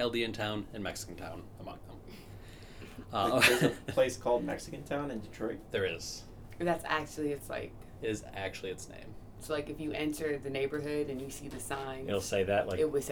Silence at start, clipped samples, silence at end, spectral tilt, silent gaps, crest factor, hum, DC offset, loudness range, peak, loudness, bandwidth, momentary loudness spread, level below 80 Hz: 0 s; under 0.1%; 0 s; -4 dB/octave; none; 26 dB; none; under 0.1%; 7 LU; -8 dBFS; -34 LUFS; over 20 kHz; 19 LU; -54 dBFS